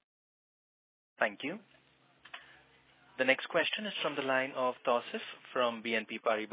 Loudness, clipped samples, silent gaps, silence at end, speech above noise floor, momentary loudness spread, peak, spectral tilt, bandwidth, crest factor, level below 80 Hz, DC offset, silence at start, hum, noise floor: -33 LUFS; under 0.1%; none; 0 s; 31 dB; 19 LU; -12 dBFS; -0.5 dB/octave; 4 kHz; 24 dB; -88 dBFS; under 0.1%; 1.2 s; none; -64 dBFS